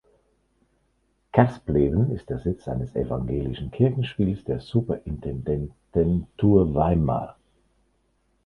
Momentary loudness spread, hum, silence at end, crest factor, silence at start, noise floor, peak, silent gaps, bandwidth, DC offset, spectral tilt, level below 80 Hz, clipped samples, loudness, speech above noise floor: 10 LU; none; 1.15 s; 22 dB; 1.35 s; -69 dBFS; -2 dBFS; none; 5.6 kHz; under 0.1%; -10 dB/octave; -40 dBFS; under 0.1%; -24 LUFS; 46 dB